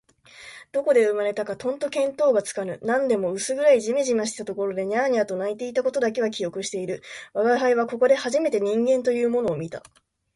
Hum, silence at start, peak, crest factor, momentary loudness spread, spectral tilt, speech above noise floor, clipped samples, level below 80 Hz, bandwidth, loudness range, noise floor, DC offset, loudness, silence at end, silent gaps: none; 0.4 s; -8 dBFS; 16 dB; 10 LU; -4 dB/octave; 24 dB; under 0.1%; -66 dBFS; 11.5 kHz; 2 LU; -47 dBFS; under 0.1%; -23 LUFS; 0.55 s; none